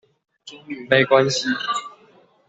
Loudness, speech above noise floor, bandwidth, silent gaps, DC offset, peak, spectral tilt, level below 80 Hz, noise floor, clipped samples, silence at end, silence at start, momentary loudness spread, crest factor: -19 LUFS; 35 dB; 8 kHz; none; under 0.1%; 0 dBFS; -4 dB/octave; -64 dBFS; -54 dBFS; under 0.1%; 0.6 s; 0.45 s; 22 LU; 22 dB